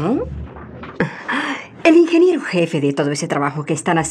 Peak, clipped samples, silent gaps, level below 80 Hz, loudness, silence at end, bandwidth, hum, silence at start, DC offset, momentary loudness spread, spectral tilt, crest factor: -2 dBFS; under 0.1%; none; -44 dBFS; -17 LUFS; 0 s; 10.5 kHz; none; 0 s; under 0.1%; 17 LU; -5.5 dB/octave; 16 dB